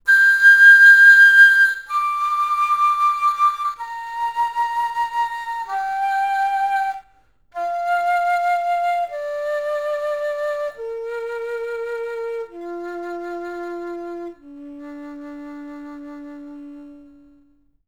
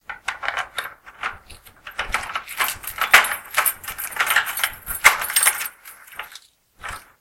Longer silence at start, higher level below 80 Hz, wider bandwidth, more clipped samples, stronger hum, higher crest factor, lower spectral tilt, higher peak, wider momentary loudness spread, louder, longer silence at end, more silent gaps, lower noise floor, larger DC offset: about the same, 0.05 s vs 0.1 s; second, -62 dBFS vs -48 dBFS; first, over 20 kHz vs 17 kHz; neither; neither; second, 16 dB vs 24 dB; first, -1 dB/octave vs 1.5 dB/octave; about the same, -2 dBFS vs 0 dBFS; first, 27 LU vs 21 LU; first, -15 LUFS vs -20 LUFS; first, 0.9 s vs 0.2 s; neither; first, -58 dBFS vs -47 dBFS; first, 0.2% vs under 0.1%